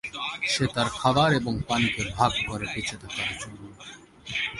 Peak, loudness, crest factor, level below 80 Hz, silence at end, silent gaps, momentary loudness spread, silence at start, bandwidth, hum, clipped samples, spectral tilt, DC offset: -6 dBFS; -26 LUFS; 20 dB; -48 dBFS; 0 s; none; 20 LU; 0.05 s; 11.5 kHz; none; under 0.1%; -4 dB/octave; under 0.1%